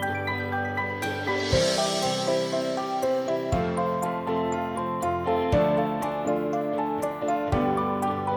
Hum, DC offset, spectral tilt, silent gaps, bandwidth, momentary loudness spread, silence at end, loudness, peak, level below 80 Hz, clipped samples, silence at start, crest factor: none; under 0.1%; -5 dB/octave; none; over 20 kHz; 5 LU; 0 s; -26 LUFS; -10 dBFS; -46 dBFS; under 0.1%; 0 s; 16 dB